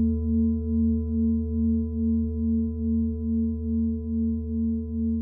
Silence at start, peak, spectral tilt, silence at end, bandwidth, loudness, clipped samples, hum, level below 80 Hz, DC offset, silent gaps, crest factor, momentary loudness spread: 0 s; -16 dBFS; -17.5 dB/octave; 0 s; 1.1 kHz; -26 LUFS; under 0.1%; none; -36 dBFS; under 0.1%; none; 10 dB; 3 LU